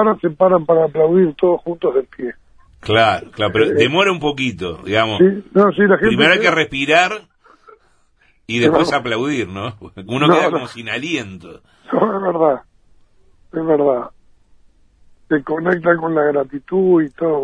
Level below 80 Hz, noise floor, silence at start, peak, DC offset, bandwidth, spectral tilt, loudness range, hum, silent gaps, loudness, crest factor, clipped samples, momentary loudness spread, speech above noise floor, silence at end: -50 dBFS; -56 dBFS; 0 s; 0 dBFS; under 0.1%; 10.5 kHz; -5.5 dB/octave; 6 LU; none; none; -16 LUFS; 16 dB; under 0.1%; 12 LU; 40 dB; 0 s